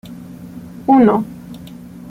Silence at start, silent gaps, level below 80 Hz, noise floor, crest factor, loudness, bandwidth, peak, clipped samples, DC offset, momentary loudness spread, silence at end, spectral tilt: 0.05 s; none; -52 dBFS; -35 dBFS; 16 dB; -14 LUFS; 15.5 kHz; -2 dBFS; under 0.1%; under 0.1%; 23 LU; 0 s; -8.5 dB/octave